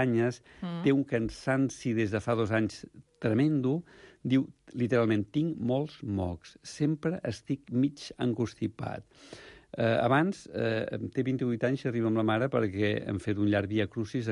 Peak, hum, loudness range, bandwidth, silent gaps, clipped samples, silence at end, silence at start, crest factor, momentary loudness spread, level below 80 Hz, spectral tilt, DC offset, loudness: -14 dBFS; none; 4 LU; 11.5 kHz; none; under 0.1%; 0 s; 0 s; 16 dB; 12 LU; -56 dBFS; -7 dB/octave; under 0.1%; -30 LUFS